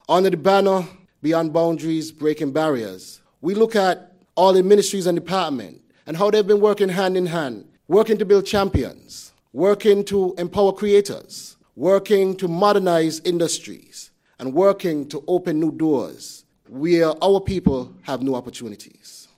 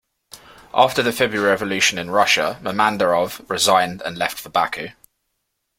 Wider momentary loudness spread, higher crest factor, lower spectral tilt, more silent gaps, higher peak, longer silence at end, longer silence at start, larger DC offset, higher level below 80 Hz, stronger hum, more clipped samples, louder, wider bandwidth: first, 19 LU vs 8 LU; about the same, 18 dB vs 20 dB; first, -5.5 dB/octave vs -2.5 dB/octave; neither; about the same, -2 dBFS vs 0 dBFS; second, 0.2 s vs 0.9 s; second, 0.1 s vs 0.35 s; neither; first, -48 dBFS vs -56 dBFS; neither; neither; about the same, -19 LUFS vs -19 LUFS; about the same, 16 kHz vs 16.5 kHz